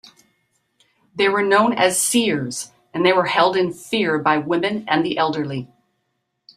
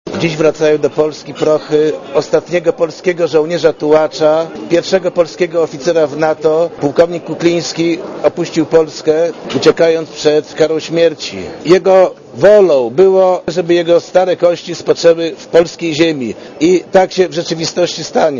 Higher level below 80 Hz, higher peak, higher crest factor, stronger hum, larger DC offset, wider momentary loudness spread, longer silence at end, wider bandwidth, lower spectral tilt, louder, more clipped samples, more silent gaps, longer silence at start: second, -64 dBFS vs -50 dBFS; about the same, -2 dBFS vs 0 dBFS; first, 20 dB vs 12 dB; neither; neither; first, 12 LU vs 7 LU; first, 0.9 s vs 0 s; first, 16 kHz vs 7.4 kHz; second, -3.5 dB/octave vs -5 dB/octave; second, -19 LUFS vs -12 LUFS; second, under 0.1% vs 0.3%; neither; first, 1.15 s vs 0.05 s